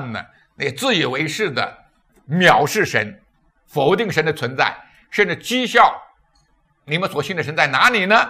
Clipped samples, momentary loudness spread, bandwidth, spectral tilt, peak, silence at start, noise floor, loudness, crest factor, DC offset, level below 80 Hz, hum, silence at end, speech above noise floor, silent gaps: under 0.1%; 13 LU; 16 kHz; -4 dB/octave; 0 dBFS; 0 s; -61 dBFS; -18 LUFS; 20 dB; under 0.1%; -60 dBFS; none; 0 s; 43 dB; none